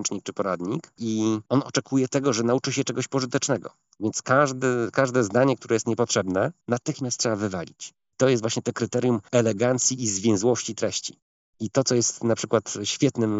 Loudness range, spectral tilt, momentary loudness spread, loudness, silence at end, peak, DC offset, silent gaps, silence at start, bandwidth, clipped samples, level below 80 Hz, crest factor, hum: 2 LU; -4.5 dB/octave; 8 LU; -24 LUFS; 0 s; -6 dBFS; under 0.1%; 11.22-11.53 s; 0 s; 8 kHz; under 0.1%; -70 dBFS; 20 dB; none